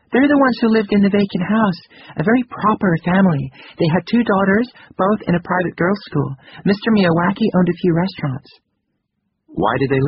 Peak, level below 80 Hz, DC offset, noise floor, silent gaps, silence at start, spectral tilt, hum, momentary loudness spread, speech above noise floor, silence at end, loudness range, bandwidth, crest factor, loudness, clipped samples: -2 dBFS; -50 dBFS; under 0.1%; -72 dBFS; none; 0.1 s; -6 dB/octave; none; 9 LU; 56 dB; 0 s; 2 LU; 5.8 kHz; 14 dB; -17 LUFS; under 0.1%